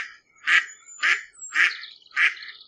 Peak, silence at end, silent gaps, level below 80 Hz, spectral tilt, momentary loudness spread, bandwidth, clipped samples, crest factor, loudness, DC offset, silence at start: -2 dBFS; 0.15 s; none; -82 dBFS; 3.5 dB/octave; 15 LU; 11.5 kHz; under 0.1%; 24 dB; -22 LUFS; under 0.1%; 0 s